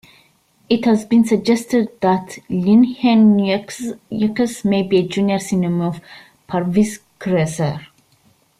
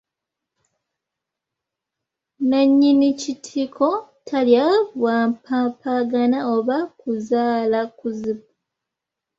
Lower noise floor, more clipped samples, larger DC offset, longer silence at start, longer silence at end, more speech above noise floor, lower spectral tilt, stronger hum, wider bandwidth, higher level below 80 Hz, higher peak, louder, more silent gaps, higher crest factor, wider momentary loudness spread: second, -57 dBFS vs -84 dBFS; neither; neither; second, 0.7 s vs 2.4 s; second, 0.75 s vs 1 s; second, 40 dB vs 65 dB; first, -6.5 dB/octave vs -5 dB/octave; neither; first, 13 kHz vs 7.8 kHz; first, -56 dBFS vs -66 dBFS; about the same, -4 dBFS vs -4 dBFS; first, -17 LUFS vs -20 LUFS; neither; about the same, 14 dB vs 18 dB; about the same, 12 LU vs 12 LU